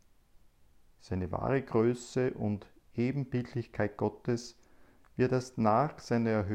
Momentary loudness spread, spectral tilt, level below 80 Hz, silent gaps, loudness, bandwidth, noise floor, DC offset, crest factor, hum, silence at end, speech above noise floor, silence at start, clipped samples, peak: 10 LU; -7.5 dB/octave; -60 dBFS; none; -32 LUFS; 10.5 kHz; -61 dBFS; under 0.1%; 18 dB; none; 0 s; 30 dB; 1.05 s; under 0.1%; -14 dBFS